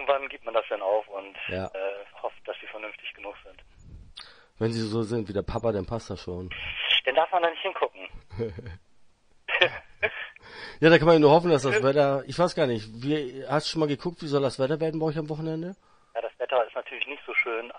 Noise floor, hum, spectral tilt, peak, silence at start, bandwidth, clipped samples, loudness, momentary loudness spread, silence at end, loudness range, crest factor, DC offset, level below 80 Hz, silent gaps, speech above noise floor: -57 dBFS; none; -5.5 dB/octave; -2 dBFS; 0 s; 10.5 kHz; under 0.1%; -26 LUFS; 17 LU; 0 s; 12 LU; 24 dB; under 0.1%; -54 dBFS; none; 31 dB